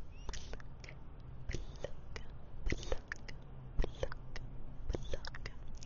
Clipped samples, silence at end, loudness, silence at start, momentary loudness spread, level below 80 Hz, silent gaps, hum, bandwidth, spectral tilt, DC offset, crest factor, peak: under 0.1%; 0 s; -47 LUFS; 0 s; 11 LU; -44 dBFS; none; none; 7.2 kHz; -4.5 dB/octave; under 0.1%; 20 dB; -20 dBFS